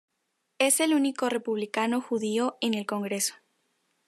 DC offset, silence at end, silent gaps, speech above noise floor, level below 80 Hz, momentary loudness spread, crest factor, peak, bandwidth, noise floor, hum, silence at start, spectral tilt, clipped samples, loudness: under 0.1%; 0.75 s; none; 51 dB; -84 dBFS; 7 LU; 20 dB; -10 dBFS; 13.5 kHz; -78 dBFS; none; 0.6 s; -3 dB/octave; under 0.1%; -27 LUFS